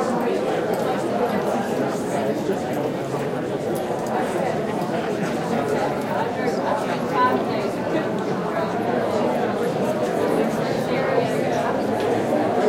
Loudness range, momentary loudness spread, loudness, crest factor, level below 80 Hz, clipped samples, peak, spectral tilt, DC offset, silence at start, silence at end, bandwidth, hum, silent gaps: 2 LU; 3 LU; -23 LUFS; 16 dB; -58 dBFS; under 0.1%; -6 dBFS; -6 dB/octave; under 0.1%; 0 s; 0 s; 16.5 kHz; none; none